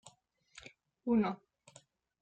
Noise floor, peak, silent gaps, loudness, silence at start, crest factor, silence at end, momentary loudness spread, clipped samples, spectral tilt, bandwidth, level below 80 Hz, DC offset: -67 dBFS; -22 dBFS; none; -34 LUFS; 1.05 s; 18 dB; 0.85 s; 24 LU; under 0.1%; -7 dB/octave; 9 kHz; -70 dBFS; under 0.1%